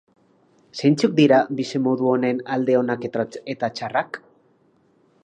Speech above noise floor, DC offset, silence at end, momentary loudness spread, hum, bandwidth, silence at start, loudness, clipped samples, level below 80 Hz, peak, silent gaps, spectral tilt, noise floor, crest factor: 40 dB; under 0.1%; 1.05 s; 11 LU; none; 9.6 kHz; 0.75 s; -21 LUFS; under 0.1%; -70 dBFS; -4 dBFS; none; -6.5 dB/octave; -60 dBFS; 18 dB